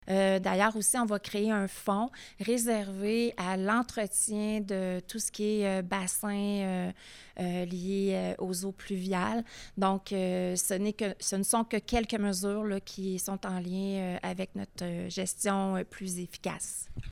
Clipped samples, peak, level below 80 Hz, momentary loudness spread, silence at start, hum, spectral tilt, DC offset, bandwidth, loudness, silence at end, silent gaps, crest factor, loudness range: under 0.1%; -12 dBFS; -54 dBFS; 9 LU; 0.05 s; none; -4.5 dB/octave; under 0.1%; 17 kHz; -31 LUFS; 0 s; none; 20 dB; 4 LU